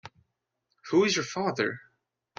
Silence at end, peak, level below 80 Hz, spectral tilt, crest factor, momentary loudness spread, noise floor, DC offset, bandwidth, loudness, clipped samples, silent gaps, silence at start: 0.6 s; -10 dBFS; -70 dBFS; -4 dB/octave; 20 dB; 7 LU; -79 dBFS; under 0.1%; 7.6 kHz; -27 LUFS; under 0.1%; none; 0.05 s